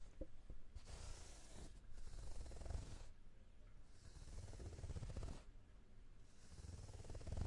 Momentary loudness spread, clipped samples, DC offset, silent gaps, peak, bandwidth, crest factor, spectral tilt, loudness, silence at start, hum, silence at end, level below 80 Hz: 15 LU; under 0.1%; under 0.1%; none; -34 dBFS; 11.5 kHz; 18 dB; -5.5 dB/octave; -58 LUFS; 0 s; none; 0 s; -56 dBFS